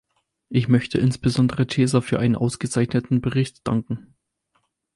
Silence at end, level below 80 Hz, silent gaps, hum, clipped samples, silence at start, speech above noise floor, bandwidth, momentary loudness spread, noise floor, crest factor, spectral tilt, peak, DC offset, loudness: 0.95 s; -50 dBFS; none; none; under 0.1%; 0.5 s; 49 dB; 11.5 kHz; 6 LU; -70 dBFS; 16 dB; -6.5 dB/octave; -6 dBFS; under 0.1%; -22 LUFS